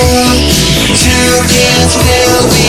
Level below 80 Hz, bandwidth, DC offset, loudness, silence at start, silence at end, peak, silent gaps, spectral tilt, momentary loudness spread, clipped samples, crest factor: -18 dBFS; over 20 kHz; under 0.1%; -7 LUFS; 0 s; 0 s; 0 dBFS; none; -3.5 dB/octave; 1 LU; 1%; 8 dB